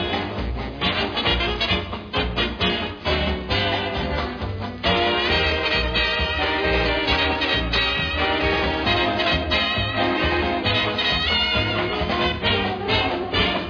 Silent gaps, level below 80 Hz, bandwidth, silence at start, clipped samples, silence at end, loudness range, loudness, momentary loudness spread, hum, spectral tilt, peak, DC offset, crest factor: none; -32 dBFS; 5.4 kHz; 0 s; under 0.1%; 0 s; 3 LU; -21 LUFS; 6 LU; none; -5.5 dB/octave; -6 dBFS; under 0.1%; 16 dB